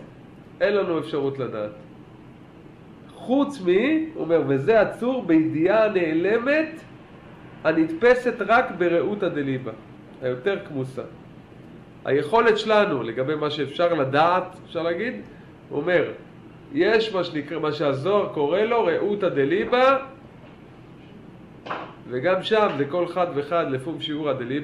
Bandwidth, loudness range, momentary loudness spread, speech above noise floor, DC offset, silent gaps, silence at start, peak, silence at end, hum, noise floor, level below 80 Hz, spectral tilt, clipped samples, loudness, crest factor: 11 kHz; 5 LU; 13 LU; 23 dB; under 0.1%; none; 0 s; -6 dBFS; 0 s; none; -45 dBFS; -58 dBFS; -7 dB/octave; under 0.1%; -23 LUFS; 18 dB